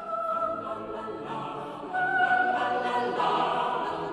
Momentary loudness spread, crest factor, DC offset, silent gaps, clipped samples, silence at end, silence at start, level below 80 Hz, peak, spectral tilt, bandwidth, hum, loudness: 12 LU; 16 dB; under 0.1%; none; under 0.1%; 0 s; 0 s; -64 dBFS; -12 dBFS; -5 dB/octave; 10.5 kHz; none; -28 LUFS